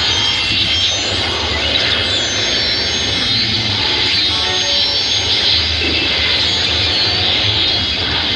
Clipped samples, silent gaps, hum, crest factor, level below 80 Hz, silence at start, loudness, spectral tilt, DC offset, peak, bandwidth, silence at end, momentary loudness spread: under 0.1%; none; none; 12 dB; -34 dBFS; 0 s; -13 LUFS; -2 dB/octave; under 0.1%; -2 dBFS; 11 kHz; 0 s; 2 LU